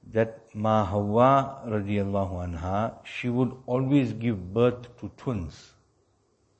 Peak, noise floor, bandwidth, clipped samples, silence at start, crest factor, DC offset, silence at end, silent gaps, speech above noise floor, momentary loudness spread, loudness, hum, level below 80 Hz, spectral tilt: -6 dBFS; -68 dBFS; 8.4 kHz; under 0.1%; 0.05 s; 20 dB; under 0.1%; 1 s; none; 42 dB; 12 LU; -27 LUFS; none; -52 dBFS; -8.5 dB/octave